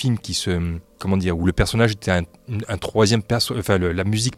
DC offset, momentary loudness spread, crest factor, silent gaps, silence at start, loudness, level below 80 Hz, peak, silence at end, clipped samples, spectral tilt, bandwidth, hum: under 0.1%; 9 LU; 16 dB; none; 0 s; -21 LUFS; -38 dBFS; -4 dBFS; 0 s; under 0.1%; -5 dB/octave; 15 kHz; none